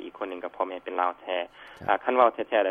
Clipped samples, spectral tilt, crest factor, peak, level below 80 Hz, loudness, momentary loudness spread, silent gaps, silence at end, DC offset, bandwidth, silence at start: under 0.1%; -6 dB/octave; 22 dB; -6 dBFS; -68 dBFS; -27 LUFS; 13 LU; none; 0 s; under 0.1%; 5 kHz; 0 s